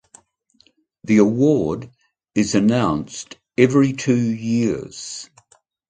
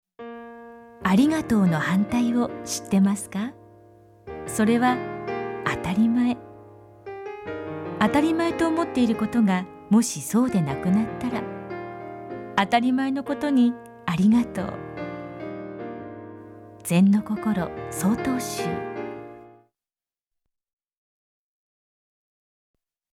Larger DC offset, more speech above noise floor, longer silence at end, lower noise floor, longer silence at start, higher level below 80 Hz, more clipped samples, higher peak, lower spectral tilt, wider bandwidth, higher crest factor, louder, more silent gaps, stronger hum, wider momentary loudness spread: neither; second, 41 dB vs over 68 dB; second, 0.65 s vs 3.65 s; second, -59 dBFS vs under -90 dBFS; first, 1.05 s vs 0.2 s; about the same, -52 dBFS vs -56 dBFS; neither; first, 0 dBFS vs -6 dBFS; about the same, -6 dB/octave vs -6 dB/octave; second, 9.4 kHz vs 16 kHz; about the same, 20 dB vs 20 dB; first, -19 LUFS vs -24 LUFS; neither; neither; about the same, 16 LU vs 17 LU